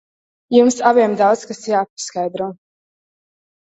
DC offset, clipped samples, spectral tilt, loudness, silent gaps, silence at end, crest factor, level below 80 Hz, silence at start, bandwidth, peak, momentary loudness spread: under 0.1%; under 0.1%; -4.5 dB/octave; -17 LUFS; 1.90-1.97 s; 1.1 s; 18 dB; -64 dBFS; 0.5 s; 8.2 kHz; 0 dBFS; 11 LU